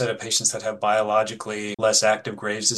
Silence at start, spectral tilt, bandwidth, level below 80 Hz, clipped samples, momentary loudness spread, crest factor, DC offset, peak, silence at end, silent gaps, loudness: 0 s; -2 dB/octave; 12.5 kHz; -68 dBFS; under 0.1%; 10 LU; 18 dB; under 0.1%; -4 dBFS; 0 s; none; -22 LUFS